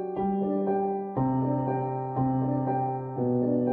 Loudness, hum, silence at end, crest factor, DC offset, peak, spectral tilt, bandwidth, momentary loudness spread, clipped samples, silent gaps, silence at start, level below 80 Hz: -28 LUFS; none; 0 s; 12 dB; under 0.1%; -16 dBFS; -13 dB/octave; 3.4 kHz; 4 LU; under 0.1%; none; 0 s; -58 dBFS